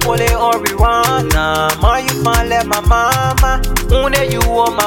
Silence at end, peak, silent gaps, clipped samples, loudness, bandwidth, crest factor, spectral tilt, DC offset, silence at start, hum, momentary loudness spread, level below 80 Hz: 0 s; 0 dBFS; none; under 0.1%; -13 LUFS; 18.5 kHz; 12 dB; -4 dB/octave; under 0.1%; 0 s; none; 2 LU; -18 dBFS